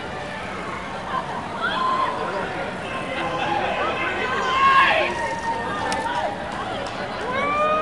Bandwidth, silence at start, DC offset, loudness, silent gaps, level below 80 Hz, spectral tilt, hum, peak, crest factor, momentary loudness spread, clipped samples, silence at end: 11.5 kHz; 0 s; 0.3%; -23 LUFS; none; -50 dBFS; -4 dB/octave; none; -4 dBFS; 20 dB; 12 LU; under 0.1%; 0 s